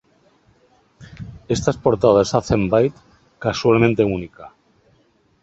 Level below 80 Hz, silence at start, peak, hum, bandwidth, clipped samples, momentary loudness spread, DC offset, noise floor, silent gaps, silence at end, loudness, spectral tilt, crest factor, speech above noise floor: -44 dBFS; 1 s; 0 dBFS; none; 8.2 kHz; under 0.1%; 21 LU; under 0.1%; -59 dBFS; none; 0.95 s; -18 LUFS; -6.5 dB/octave; 20 dB; 42 dB